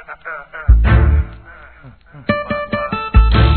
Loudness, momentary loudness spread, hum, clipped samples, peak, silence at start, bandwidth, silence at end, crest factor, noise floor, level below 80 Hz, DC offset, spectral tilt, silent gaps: -15 LUFS; 16 LU; none; under 0.1%; 0 dBFS; 0.1 s; 4.5 kHz; 0 s; 14 dB; -41 dBFS; -16 dBFS; 0.3%; -10.5 dB/octave; none